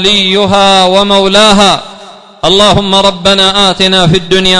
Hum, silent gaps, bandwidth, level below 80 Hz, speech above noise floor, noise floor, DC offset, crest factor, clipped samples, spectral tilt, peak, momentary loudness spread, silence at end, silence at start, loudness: none; none; 12 kHz; -32 dBFS; 25 dB; -31 dBFS; under 0.1%; 8 dB; 2%; -3.5 dB/octave; 0 dBFS; 3 LU; 0 s; 0 s; -6 LUFS